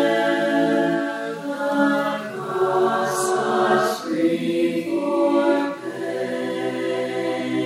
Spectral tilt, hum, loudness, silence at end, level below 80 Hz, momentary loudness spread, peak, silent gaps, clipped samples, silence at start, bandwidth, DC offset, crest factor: -4.5 dB/octave; none; -22 LUFS; 0 s; -74 dBFS; 8 LU; -6 dBFS; none; under 0.1%; 0 s; 15 kHz; under 0.1%; 14 dB